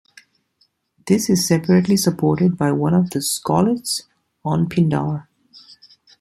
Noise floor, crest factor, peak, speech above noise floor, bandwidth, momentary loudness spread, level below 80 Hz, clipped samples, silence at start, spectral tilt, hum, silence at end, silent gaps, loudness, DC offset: -64 dBFS; 18 dB; -2 dBFS; 47 dB; 15 kHz; 9 LU; -54 dBFS; under 0.1%; 1.05 s; -5.5 dB/octave; none; 1 s; none; -18 LUFS; under 0.1%